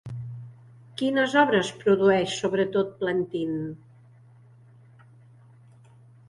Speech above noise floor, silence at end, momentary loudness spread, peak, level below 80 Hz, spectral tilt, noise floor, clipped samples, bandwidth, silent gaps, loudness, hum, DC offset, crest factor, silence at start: 29 dB; 2.5 s; 20 LU; -8 dBFS; -64 dBFS; -5.5 dB/octave; -53 dBFS; under 0.1%; 11.5 kHz; none; -24 LUFS; none; under 0.1%; 20 dB; 0.05 s